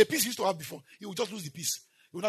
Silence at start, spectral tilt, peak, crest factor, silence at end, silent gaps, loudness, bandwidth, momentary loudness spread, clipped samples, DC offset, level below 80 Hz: 0 s; -2.5 dB/octave; -8 dBFS; 24 dB; 0 s; none; -32 LUFS; 13.5 kHz; 16 LU; under 0.1%; under 0.1%; -80 dBFS